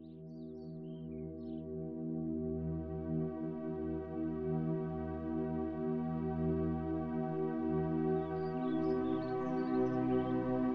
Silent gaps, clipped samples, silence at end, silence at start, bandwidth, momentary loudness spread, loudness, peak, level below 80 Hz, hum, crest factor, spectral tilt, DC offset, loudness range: none; under 0.1%; 0 s; 0 s; 5.4 kHz; 11 LU; -37 LUFS; -24 dBFS; -58 dBFS; none; 14 dB; -10.5 dB/octave; under 0.1%; 5 LU